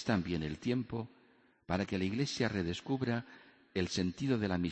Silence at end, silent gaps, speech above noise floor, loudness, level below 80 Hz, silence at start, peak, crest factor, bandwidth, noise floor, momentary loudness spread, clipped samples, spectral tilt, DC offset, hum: 0 s; none; 33 dB; -36 LUFS; -60 dBFS; 0 s; -18 dBFS; 18 dB; 8.4 kHz; -67 dBFS; 8 LU; under 0.1%; -6 dB/octave; under 0.1%; none